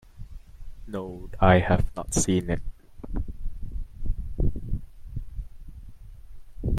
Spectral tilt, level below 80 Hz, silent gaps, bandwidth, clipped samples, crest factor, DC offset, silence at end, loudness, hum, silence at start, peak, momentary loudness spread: -5.5 dB/octave; -34 dBFS; none; 13.5 kHz; under 0.1%; 22 dB; under 0.1%; 0 s; -27 LUFS; none; 0.15 s; -6 dBFS; 26 LU